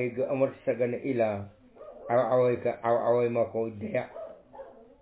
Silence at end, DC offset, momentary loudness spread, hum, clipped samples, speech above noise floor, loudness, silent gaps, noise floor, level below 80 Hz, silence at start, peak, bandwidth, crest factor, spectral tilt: 0.2 s; under 0.1%; 21 LU; none; under 0.1%; 21 dB; -28 LUFS; none; -48 dBFS; -64 dBFS; 0 s; -14 dBFS; 4 kHz; 16 dB; -11 dB/octave